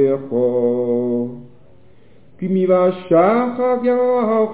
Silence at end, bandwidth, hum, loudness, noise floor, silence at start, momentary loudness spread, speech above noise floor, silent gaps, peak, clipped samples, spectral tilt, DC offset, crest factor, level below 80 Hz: 0 s; 4 kHz; none; -17 LUFS; -50 dBFS; 0 s; 8 LU; 34 dB; none; -4 dBFS; under 0.1%; -11.5 dB/octave; 0.7%; 14 dB; -60 dBFS